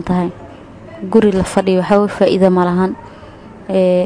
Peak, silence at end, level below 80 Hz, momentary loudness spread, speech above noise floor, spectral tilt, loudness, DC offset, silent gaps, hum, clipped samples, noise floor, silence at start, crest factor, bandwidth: 0 dBFS; 0 s; -40 dBFS; 18 LU; 23 dB; -7 dB/octave; -14 LUFS; under 0.1%; none; none; under 0.1%; -36 dBFS; 0 s; 14 dB; 11 kHz